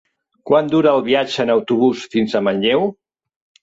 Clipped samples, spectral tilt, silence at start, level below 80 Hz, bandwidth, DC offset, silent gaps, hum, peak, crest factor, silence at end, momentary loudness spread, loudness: under 0.1%; -6 dB/octave; 0.45 s; -60 dBFS; 8 kHz; under 0.1%; none; none; -2 dBFS; 16 dB; 0.7 s; 4 LU; -17 LUFS